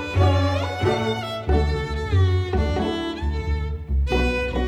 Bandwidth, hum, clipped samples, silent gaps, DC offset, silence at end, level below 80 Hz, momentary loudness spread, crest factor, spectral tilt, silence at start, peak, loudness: 9.8 kHz; none; under 0.1%; none; under 0.1%; 0 s; -28 dBFS; 7 LU; 14 dB; -7 dB/octave; 0 s; -8 dBFS; -23 LUFS